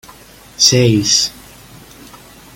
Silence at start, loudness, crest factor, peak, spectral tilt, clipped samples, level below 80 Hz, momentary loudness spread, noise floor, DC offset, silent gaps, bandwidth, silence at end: 0.6 s; -11 LUFS; 18 dB; 0 dBFS; -3.5 dB/octave; under 0.1%; -46 dBFS; 5 LU; -40 dBFS; under 0.1%; none; 17 kHz; 1.25 s